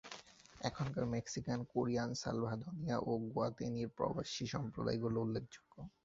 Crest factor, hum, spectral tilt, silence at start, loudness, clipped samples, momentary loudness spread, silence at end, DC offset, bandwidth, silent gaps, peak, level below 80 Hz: 20 dB; none; -6 dB/octave; 0.05 s; -40 LUFS; under 0.1%; 10 LU; 0.15 s; under 0.1%; 7.6 kHz; none; -22 dBFS; -64 dBFS